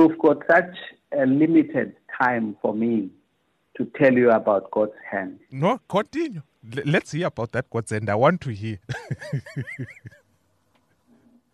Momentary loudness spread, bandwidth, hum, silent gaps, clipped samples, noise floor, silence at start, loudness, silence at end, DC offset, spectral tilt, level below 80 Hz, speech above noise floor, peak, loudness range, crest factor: 16 LU; 11 kHz; none; none; under 0.1%; -69 dBFS; 0 s; -23 LUFS; 1.45 s; under 0.1%; -7 dB/octave; -62 dBFS; 47 dB; -6 dBFS; 5 LU; 18 dB